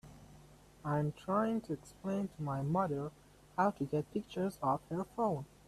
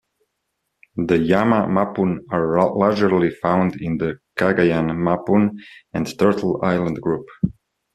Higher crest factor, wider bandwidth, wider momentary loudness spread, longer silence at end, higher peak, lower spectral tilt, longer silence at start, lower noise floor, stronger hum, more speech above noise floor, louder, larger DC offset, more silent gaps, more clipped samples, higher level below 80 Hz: about the same, 18 dB vs 18 dB; about the same, 14 kHz vs 13 kHz; about the same, 9 LU vs 9 LU; second, 0.2 s vs 0.45 s; second, -20 dBFS vs -2 dBFS; about the same, -8 dB/octave vs -8 dB/octave; second, 0.05 s vs 0.95 s; second, -59 dBFS vs -76 dBFS; neither; second, 24 dB vs 57 dB; second, -37 LUFS vs -20 LUFS; neither; neither; neither; second, -66 dBFS vs -52 dBFS